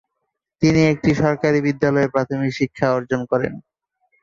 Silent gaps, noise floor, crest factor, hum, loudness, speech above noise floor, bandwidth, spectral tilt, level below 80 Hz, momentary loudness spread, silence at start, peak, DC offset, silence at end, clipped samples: none; -77 dBFS; 16 dB; none; -19 LUFS; 59 dB; 7.6 kHz; -7 dB/octave; -48 dBFS; 6 LU; 0.6 s; -4 dBFS; under 0.1%; 0.65 s; under 0.1%